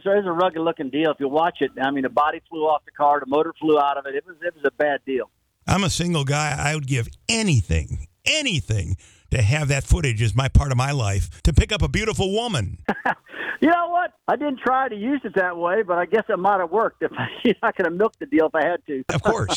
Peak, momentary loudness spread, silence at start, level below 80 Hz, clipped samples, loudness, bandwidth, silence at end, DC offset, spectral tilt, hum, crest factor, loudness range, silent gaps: -4 dBFS; 7 LU; 0.05 s; -32 dBFS; under 0.1%; -22 LUFS; 14 kHz; 0 s; under 0.1%; -5 dB/octave; none; 18 dB; 1 LU; none